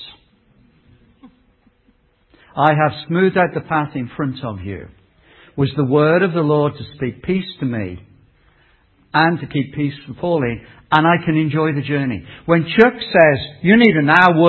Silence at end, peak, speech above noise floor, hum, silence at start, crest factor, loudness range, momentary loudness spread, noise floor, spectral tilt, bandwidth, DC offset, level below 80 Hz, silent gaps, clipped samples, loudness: 0 s; 0 dBFS; 42 dB; none; 0 s; 18 dB; 7 LU; 15 LU; -58 dBFS; -8.5 dB/octave; 6 kHz; under 0.1%; -48 dBFS; none; under 0.1%; -17 LUFS